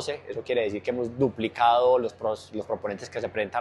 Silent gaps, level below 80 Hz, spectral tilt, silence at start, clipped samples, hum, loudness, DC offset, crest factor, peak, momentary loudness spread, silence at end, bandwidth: none; -64 dBFS; -5.5 dB/octave; 0 s; under 0.1%; none; -27 LUFS; under 0.1%; 18 dB; -8 dBFS; 12 LU; 0 s; 11.5 kHz